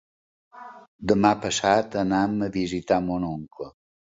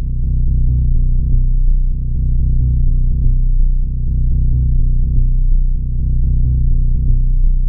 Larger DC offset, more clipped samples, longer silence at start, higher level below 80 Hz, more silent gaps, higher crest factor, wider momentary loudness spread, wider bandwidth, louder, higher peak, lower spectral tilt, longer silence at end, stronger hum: second, under 0.1% vs 1%; neither; first, 0.55 s vs 0 s; second, -52 dBFS vs -12 dBFS; first, 0.88-0.99 s vs none; first, 22 dB vs 10 dB; first, 19 LU vs 4 LU; first, 8 kHz vs 0.6 kHz; second, -24 LUFS vs -18 LUFS; about the same, -4 dBFS vs -2 dBFS; second, -5 dB/octave vs -19.5 dB/octave; first, 0.45 s vs 0 s; neither